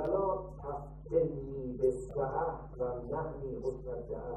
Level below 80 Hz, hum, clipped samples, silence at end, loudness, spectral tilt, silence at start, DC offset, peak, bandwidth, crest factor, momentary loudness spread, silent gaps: -50 dBFS; none; under 0.1%; 0 s; -36 LUFS; -9.5 dB/octave; 0 s; under 0.1%; -18 dBFS; 9.8 kHz; 18 dB; 9 LU; none